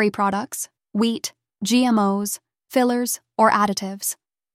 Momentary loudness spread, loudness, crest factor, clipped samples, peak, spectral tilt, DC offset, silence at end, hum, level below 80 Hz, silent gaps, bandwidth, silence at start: 12 LU; -22 LUFS; 18 dB; under 0.1%; -4 dBFS; -4 dB/octave; under 0.1%; 0.4 s; none; -66 dBFS; none; 16 kHz; 0 s